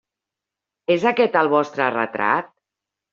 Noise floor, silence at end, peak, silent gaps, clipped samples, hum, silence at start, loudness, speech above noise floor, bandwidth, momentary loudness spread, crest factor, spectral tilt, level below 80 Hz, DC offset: -86 dBFS; 0.65 s; -2 dBFS; none; under 0.1%; none; 0.9 s; -20 LUFS; 67 dB; 7.2 kHz; 5 LU; 20 dB; -3 dB/octave; -68 dBFS; under 0.1%